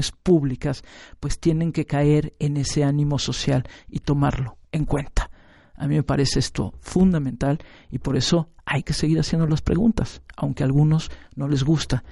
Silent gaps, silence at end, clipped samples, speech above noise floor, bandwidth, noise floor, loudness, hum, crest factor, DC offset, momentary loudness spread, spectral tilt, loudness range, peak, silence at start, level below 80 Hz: none; 0 s; under 0.1%; 24 dB; 11.5 kHz; -46 dBFS; -23 LUFS; none; 16 dB; under 0.1%; 11 LU; -6 dB/octave; 3 LU; -6 dBFS; 0 s; -36 dBFS